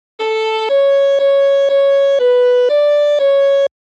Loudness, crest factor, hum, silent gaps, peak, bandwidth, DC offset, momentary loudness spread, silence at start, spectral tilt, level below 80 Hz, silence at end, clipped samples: -12 LUFS; 6 dB; none; none; -6 dBFS; 7.6 kHz; under 0.1%; 5 LU; 0.2 s; 0 dB/octave; -78 dBFS; 0.3 s; under 0.1%